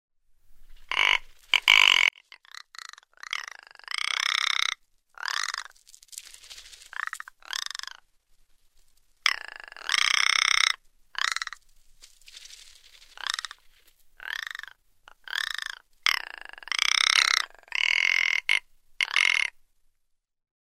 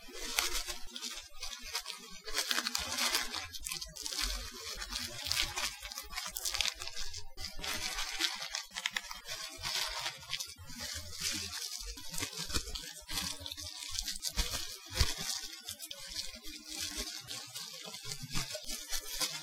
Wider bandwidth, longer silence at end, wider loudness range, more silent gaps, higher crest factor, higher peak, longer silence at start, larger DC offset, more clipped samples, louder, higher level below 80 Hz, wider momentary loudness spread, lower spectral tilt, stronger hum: second, 16 kHz vs 18 kHz; first, 1.2 s vs 0 s; first, 14 LU vs 3 LU; neither; about the same, 30 dB vs 32 dB; first, 0 dBFS vs -6 dBFS; first, 0.5 s vs 0 s; neither; neither; first, -24 LUFS vs -37 LUFS; second, -60 dBFS vs -50 dBFS; first, 23 LU vs 10 LU; second, 4 dB/octave vs -0.5 dB/octave; neither